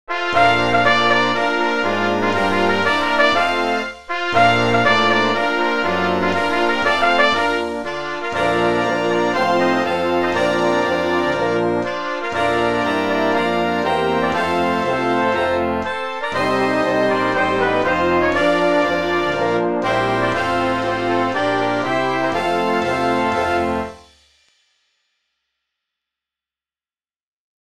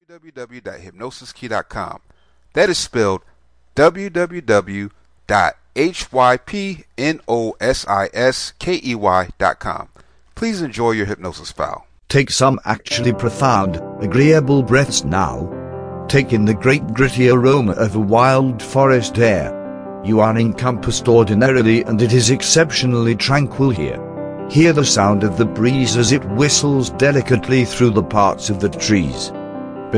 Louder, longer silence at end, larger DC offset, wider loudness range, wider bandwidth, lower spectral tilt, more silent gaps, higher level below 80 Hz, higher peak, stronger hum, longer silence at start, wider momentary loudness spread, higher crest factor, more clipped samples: about the same, -17 LUFS vs -16 LUFS; first, 0.35 s vs 0 s; first, 0.8% vs under 0.1%; about the same, 3 LU vs 5 LU; first, 15.5 kHz vs 10.5 kHz; about the same, -5 dB/octave vs -5 dB/octave; first, 27.16-27.37 s vs none; second, -48 dBFS vs -42 dBFS; about the same, 0 dBFS vs 0 dBFS; neither; about the same, 0.1 s vs 0.1 s; second, 6 LU vs 15 LU; about the same, 18 dB vs 16 dB; neither